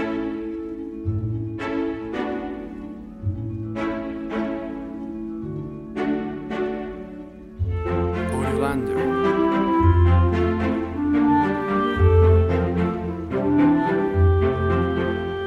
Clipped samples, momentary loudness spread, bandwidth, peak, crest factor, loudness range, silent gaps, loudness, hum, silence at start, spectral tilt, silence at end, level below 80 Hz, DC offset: under 0.1%; 14 LU; 9.8 kHz; -6 dBFS; 16 dB; 10 LU; none; -23 LUFS; none; 0 s; -9 dB/octave; 0 s; -34 dBFS; under 0.1%